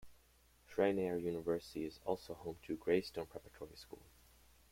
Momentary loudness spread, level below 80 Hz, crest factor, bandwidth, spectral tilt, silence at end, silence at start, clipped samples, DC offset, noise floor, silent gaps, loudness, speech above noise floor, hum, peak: 18 LU; -68 dBFS; 22 dB; 16.5 kHz; -6 dB/octave; 0.7 s; 0 s; under 0.1%; under 0.1%; -69 dBFS; none; -40 LUFS; 29 dB; none; -20 dBFS